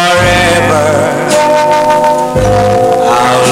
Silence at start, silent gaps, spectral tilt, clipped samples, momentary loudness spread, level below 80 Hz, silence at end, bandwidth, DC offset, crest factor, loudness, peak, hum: 0 s; none; -4.5 dB/octave; under 0.1%; 3 LU; -30 dBFS; 0 s; 16.5 kHz; under 0.1%; 8 dB; -8 LUFS; 0 dBFS; none